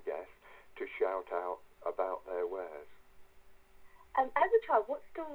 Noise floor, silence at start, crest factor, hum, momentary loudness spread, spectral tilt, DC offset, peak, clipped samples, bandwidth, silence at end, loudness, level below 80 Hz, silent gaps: -57 dBFS; 0 s; 20 dB; none; 16 LU; -5 dB/octave; under 0.1%; -16 dBFS; under 0.1%; over 20 kHz; 0 s; -35 LUFS; -68 dBFS; none